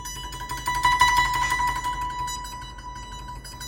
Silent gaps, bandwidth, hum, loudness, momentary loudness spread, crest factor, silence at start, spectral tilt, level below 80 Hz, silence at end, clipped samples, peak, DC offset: none; 20 kHz; none; -23 LUFS; 19 LU; 22 dB; 0 s; -1.5 dB/octave; -40 dBFS; 0 s; under 0.1%; -4 dBFS; under 0.1%